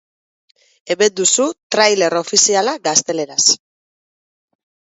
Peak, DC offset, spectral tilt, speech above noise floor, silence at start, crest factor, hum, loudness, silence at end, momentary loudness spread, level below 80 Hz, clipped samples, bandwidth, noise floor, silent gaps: 0 dBFS; under 0.1%; -1 dB/octave; over 75 dB; 0.85 s; 18 dB; none; -14 LUFS; 1.4 s; 6 LU; -68 dBFS; under 0.1%; 8.2 kHz; under -90 dBFS; 1.63-1.70 s